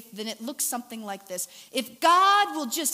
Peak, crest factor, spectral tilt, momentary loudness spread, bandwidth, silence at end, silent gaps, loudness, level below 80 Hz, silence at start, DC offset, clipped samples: -6 dBFS; 20 dB; -1 dB/octave; 16 LU; 16 kHz; 0 s; none; -25 LUFS; -88 dBFS; 0 s; under 0.1%; under 0.1%